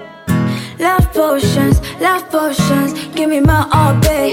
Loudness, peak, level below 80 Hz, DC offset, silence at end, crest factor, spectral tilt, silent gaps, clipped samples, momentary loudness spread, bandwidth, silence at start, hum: -14 LUFS; 0 dBFS; -24 dBFS; under 0.1%; 0 s; 12 dB; -6 dB/octave; none; under 0.1%; 6 LU; 17 kHz; 0 s; none